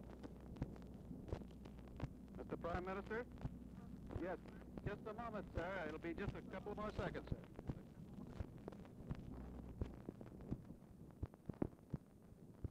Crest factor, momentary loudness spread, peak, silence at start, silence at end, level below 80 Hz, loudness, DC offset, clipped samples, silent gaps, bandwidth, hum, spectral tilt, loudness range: 22 dB; 10 LU; -28 dBFS; 0 s; 0 s; -58 dBFS; -51 LUFS; under 0.1%; under 0.1%; none; 15.5 kHz; none; -8 dB/octave; 5 LU